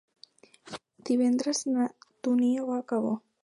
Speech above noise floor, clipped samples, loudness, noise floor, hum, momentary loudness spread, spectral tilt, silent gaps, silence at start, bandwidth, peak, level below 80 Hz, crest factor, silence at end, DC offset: 30 dB; under 0.1%; -28 LUFS; -57 dBFS; none; 17 LU; -4.5 dB/octave; none; 0.65 s; 11.5 kHz; -16 dBFS; -80 dBFS; 14 dB; 0.25 s; under 0.1%